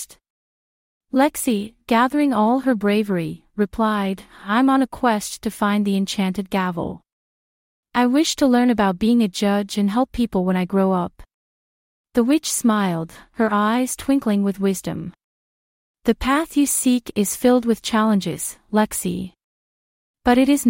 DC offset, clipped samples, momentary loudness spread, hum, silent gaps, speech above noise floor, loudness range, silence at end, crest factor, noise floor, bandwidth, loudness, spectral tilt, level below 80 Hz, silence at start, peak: under 0.1%; under 0.1%; 9 LU; none; 0.30-1.01 s, 7.13-7.83 s, 11.34-12.04 s, 15.24-15.94 s, 19.44-20.14 s; over 71 dB; 3 LU; 0 s; 18 dB; under -90 dBFS; 16.5 kHz; -20 LUFS; -5 dB/octave; -48 dBFS; 0 s; -4 dBFS